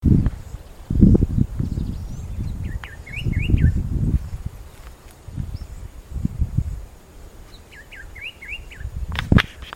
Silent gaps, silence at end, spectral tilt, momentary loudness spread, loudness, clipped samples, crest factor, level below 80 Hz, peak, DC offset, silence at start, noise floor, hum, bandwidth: none; 0.05 s; -7.5 dB/octave; 23 LU; -23 LUFS; under 0.1%; 22 dB; -28 dBFS; 0 dBFS; under 0.1%; 0 s; -42 dBFS; none; 16 kHz